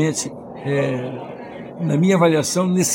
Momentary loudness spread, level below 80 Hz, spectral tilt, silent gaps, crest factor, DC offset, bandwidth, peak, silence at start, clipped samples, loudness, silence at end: 17 LU; -60 dBFS; -5 dB/octave; none; 16 dB; under 0.1%; 17 kHz; -4 dBFS; 0 s; under 0.1%; -19 LUFS; 0 s